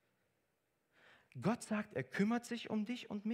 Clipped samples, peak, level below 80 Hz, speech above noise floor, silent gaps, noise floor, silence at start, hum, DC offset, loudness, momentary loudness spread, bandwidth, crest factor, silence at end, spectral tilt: under 0.1%; -22 dBFS; -82 dBFS; 44 dB; none; -83 dBFS; 1.35 s; none; under 0.1%; -40 LUFS; 6 LU; 14 kHz; 20 dB; 0 s; -6 dB/octave